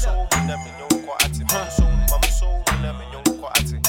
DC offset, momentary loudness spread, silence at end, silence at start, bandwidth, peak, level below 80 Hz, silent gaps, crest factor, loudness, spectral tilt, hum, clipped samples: under 0.1%; 5 LU; 0 s; 0 s; 17.5 kHz; -4 dBFS; -22 dBFS; none; 16 dB; -21 LUFS; -3.5 dB/octave; none; under 0.1%